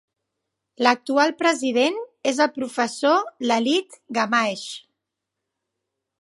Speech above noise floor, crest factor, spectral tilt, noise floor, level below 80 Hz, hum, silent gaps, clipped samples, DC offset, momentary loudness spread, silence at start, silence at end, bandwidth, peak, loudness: 61 dB; 22 dB; -3 dB/octave; -83 dBFS; -78 dBFS; none; none; under 0.1%; under 0.1%; 7 LU; 0.8 s; 1.45 s; 11.5 kHz; 0 dBFS; -21 LUFS